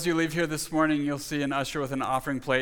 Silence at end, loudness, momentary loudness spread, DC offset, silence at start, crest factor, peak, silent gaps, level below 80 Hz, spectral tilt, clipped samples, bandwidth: 0 s; -28 LUFS; 5 LU; under 0.1%; 0 s; 18 dB; -10 dBFS; none; -54 dBFS; -4.5 dB/octave; under 0.1%; 19 kHz